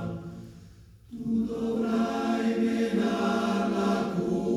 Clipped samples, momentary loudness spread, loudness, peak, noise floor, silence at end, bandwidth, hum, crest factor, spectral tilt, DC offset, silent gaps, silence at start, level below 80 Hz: under 0.1%; 14 LU; -28 LUFS; -14 dBFS; -51 dBFS; 0 s; 13 kHz; none; 14 dB; -6.5 dB/octave; under 0.1%; none; 0 s; -58 dBFS